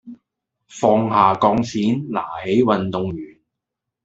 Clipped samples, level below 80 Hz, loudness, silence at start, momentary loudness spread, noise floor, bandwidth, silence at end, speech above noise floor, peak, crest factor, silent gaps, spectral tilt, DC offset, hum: under 0.1%; -54 dBFS; -19 LUFS; 0.05 s; 11 LU; -82 dBFS; 8 kHz; 0.75 s; 64 dB; 0 dBFS; 20 dB; none; -6.5 dB/octave; under 0.1%; none